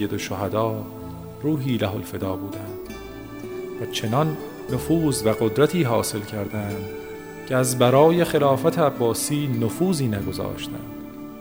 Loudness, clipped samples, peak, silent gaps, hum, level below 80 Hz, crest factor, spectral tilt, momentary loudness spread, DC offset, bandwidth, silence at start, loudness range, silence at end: -23 LUFS; under 0.1%; -4 dBFS; none; none; -50 dBFS; 20 dB; -5.5 dB/octave; 16 LU; under 0.1%; 16.5 kHz; 0 s; 7 LU; 0 s